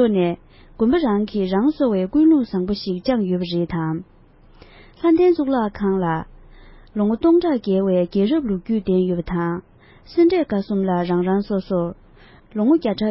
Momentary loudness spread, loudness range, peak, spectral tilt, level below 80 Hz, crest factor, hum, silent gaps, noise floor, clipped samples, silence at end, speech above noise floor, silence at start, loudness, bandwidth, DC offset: 9 LU; 2 LU; -6 dBFS; -12 dB/octave; -46 dBFS; 14 dB; none; none; -48 dBFS; under 0.1%; 0 s; 29 dB; 0 s; -20 LUFS; 5.8 kHz; under 0.1%